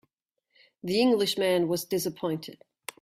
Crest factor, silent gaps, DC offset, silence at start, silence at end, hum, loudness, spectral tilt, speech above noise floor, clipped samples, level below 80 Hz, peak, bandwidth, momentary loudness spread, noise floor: 16 dB; none; under 0.1%; 0.85 s; 0.45 s; none; -27 LUFS; -4.5 dB/octave; 54 dB; under 0.1%; -68 dBFS; -14 dBFS; 16 kHz; 19 LU; -81 dBFS